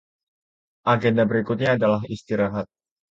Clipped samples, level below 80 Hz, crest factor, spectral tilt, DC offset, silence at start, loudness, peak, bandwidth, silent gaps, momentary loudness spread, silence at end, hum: under 0.1%; -56 dBFS; 18 dB; -7.5 dB/octave; under 0.1%; 0.85 s; -22 LUFS; -6 dBFS; 7.6 kHz; none; 8 LU; 0.5 s; none